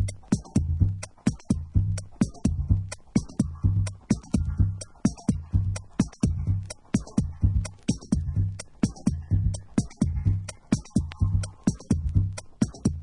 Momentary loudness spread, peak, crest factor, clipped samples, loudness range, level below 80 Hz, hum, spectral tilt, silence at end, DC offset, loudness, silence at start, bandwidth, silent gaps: 4 LU; -8 dBFS; 18 dB; under 0.1%; 1 LU; -34 dBFS; none; -7 dB/octave; 0 s; under 0.1%; -28 LUFS; 0 s; 11 kHz; none